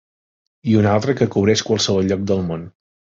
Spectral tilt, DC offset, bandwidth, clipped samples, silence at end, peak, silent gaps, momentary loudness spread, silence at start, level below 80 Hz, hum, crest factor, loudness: -5.5 dB/octave; under 0.1%; 7.8 kHz; under 0.1%; 0.45 s; -2 dBFS; none; 10 LU; 0.65 s; -44 dBFS; none; 16 dB; -18 LUFS